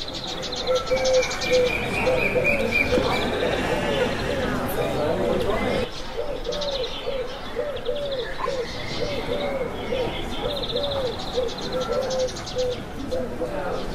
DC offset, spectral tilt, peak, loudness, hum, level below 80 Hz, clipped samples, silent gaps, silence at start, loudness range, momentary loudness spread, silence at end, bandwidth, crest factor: under 0.1%; -4 dB/octave; -8 dBFS; -25 LUFS; none; -38 dBFS; under 0.1%; none; 0 s; 6 LU; 9 LU; 0 s; 15.5 kHz; 16 dB